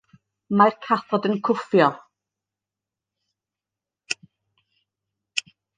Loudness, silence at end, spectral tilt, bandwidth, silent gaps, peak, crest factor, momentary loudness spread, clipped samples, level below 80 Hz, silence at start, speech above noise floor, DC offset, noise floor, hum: -22 LUFS; 0.35 s; -5 dB/octave; 9.6 kHz; none; -2 dBFS; 24 dB; 12 LU; under 0.1%; -76 dBFS; 0.5 s; 69 dB; under 0.1%; -89 dBFS; none